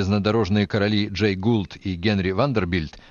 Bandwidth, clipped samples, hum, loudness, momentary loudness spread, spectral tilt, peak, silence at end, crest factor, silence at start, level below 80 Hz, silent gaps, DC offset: 7.2 kHz; under 0.1%; none; -22 LUFS; 5 LU; -7 dB/octave; -6 dBFS; 0.1 s; 16 dB; 0 s; -46 dBFS; none; under 0.1%